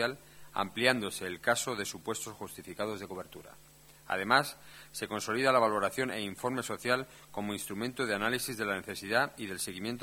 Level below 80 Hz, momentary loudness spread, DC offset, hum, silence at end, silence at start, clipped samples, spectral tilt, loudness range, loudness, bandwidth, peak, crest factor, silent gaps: -68 dBFS; 15 LU; under 0.1%; none; 0 s; 0 s; under 0.1%; -3 dB/octave; 4 LU; -33 LUFS; 17 kHz; -8 dBFS; 26 dB; none